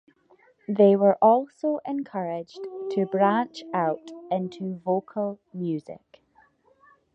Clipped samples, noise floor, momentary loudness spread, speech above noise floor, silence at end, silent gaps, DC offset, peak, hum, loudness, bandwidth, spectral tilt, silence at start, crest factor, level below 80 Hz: under 0.1%; -62 dBFS; 16 LU; 37 dB; 1.15 s; none; under 0.1%; -6 dBFS; none; -25 LUFS; 7.8 kHz; -8 dB/octave; 0.7 s; 20 dB; -74 dBFS